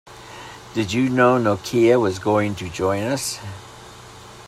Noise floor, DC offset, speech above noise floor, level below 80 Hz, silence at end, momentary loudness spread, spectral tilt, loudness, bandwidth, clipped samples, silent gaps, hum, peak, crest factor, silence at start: -41 dBFS; under 0.1%; 22 dB; -54 dBFS; 0 s; 24 LU; -5.5 dB/octave; -20 LUFS; 15 kHz; under 0.1%; none; none; -4 dBFS; 18 dB; 0.05 s